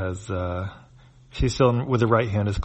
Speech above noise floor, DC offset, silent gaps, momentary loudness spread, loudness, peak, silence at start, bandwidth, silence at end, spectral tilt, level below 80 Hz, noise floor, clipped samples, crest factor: 28 dB; under 0.1%; none; 12 LU; -23 LUFS; -6 dBFS; 0 s; 8.8 kHz; 0 s; -7 dB/octave; -38 dBFS; -51 dBFS; under 0.1%; 18 dB